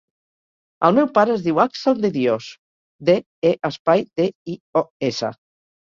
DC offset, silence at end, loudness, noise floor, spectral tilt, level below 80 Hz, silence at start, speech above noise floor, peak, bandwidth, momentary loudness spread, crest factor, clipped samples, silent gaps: under 0.1%; 0.6 s; -20 LUFS; under -90 dBFS; -6.5 dB/octave; -62 dBFS; 0.8 s; over 71 dB; -2 dBFS; 7.4 kHz; 8 LU; 20 dB; under 0.1%; 2.58-2.99 s, 3.26-3.42 s, 3.79-3.85 s, 4.35-4.46 s, 4.60-4.73 s, 4.90-5.00 s